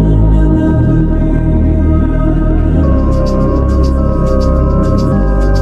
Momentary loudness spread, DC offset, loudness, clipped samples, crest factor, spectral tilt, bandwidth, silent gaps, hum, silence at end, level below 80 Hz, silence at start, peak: 2 LU; under 0.1%; -12 LUFS; under 0.1%; 8 dB; -9.5 dB/octave; 7.6 kHz; none; none; 0 s; -12 dBFS; 0 s; 0 dBFS